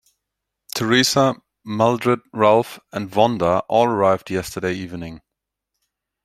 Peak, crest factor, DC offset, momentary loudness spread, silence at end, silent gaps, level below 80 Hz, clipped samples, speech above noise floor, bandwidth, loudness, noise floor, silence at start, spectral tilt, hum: -2 dBFS; 20 dB; under 0.1%; 14 LU; 1.1 s; none; -56 dBFS; under 0.1%; 63 dB; 16 kHz; -19 LUFS; -82 dBFS; 0.75 s; -4.5 dB/octave; none